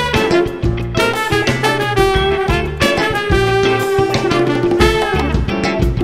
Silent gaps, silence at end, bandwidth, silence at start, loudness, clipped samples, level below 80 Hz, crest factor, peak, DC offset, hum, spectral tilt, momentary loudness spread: none; 0 s; 16 kHz; 0 s; -15 LUFS; under 0.1%; -24 dBFS; 14 dB; 0 dBFS; 0.3%; none; -5.5 dB/octave; 4 LU